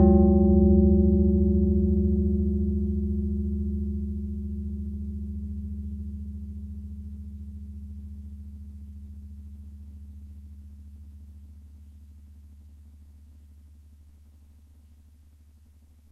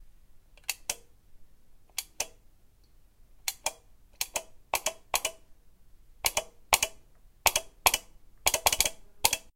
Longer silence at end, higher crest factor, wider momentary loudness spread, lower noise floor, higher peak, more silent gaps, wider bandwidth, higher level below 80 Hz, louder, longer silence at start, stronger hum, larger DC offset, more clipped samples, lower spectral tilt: first, 3.05 s vs 0.15 s; second, 20 dB vs 32 dB; first, 26 LU vs 11 LU; about the same, -55 dBFS vs -58 dBFS; second, -6 dBFS vs -2 dBFS; neither; second, 1.3 kHz vs 17 kHz; first, -32 dBFS vs -54 dBFS; first, -25 LUFS vs -30 LUFS; about the same, 0 s vs 0 s; neither; neither; neither; first, -13 dB/octave vs 0.5 dB/octave